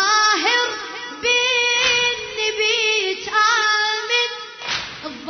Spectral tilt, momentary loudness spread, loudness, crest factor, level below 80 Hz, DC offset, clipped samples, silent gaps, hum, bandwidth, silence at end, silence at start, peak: 0.5 dB/octave; 10 LU; -17 LUFS; 16 dB; -58 dBFS; under 0.1%; under 0.1%; none; none; 6.6 kHz; 0 s; 0 s; -4 dBFS